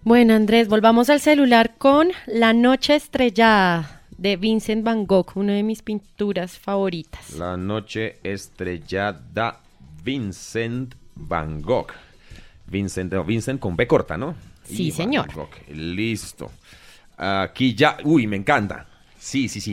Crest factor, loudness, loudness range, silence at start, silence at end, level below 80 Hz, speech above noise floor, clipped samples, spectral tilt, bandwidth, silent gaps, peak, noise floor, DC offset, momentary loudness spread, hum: 18 dB; -20 LUFS; 11 LU; 0.05 s; 0 s; -46 dBFS; 24 dB; under 0.1%; -5.5 dB/octave; 16.5 kHz; none; -2 dBFS; -44 dBFS; under 0.1%; 16 LU; none